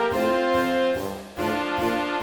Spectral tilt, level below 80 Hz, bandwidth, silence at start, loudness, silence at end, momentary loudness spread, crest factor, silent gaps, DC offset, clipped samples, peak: -5 dB/octave; -50 dBFS; over 20 kHz; 0 s; -24 LUFS; 0 s; 7 LU; 14 dB; none; under 0.1%; under 0.1%; -10 dBFS